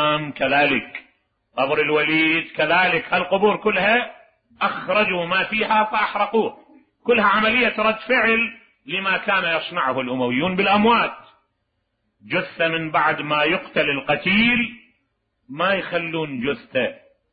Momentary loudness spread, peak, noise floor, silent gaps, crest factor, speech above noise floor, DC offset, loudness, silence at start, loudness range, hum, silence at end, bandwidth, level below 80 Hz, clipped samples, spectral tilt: 9 LU; -6 dBFS; -73 dBFS; none; 16 dB; 53 dB; under 0.1%; -19 LUFS; 0 s; 3 LU; none; 0.35 s; 5 kHz; -56 dBFS; under 0.1%; -9.5 dB/octave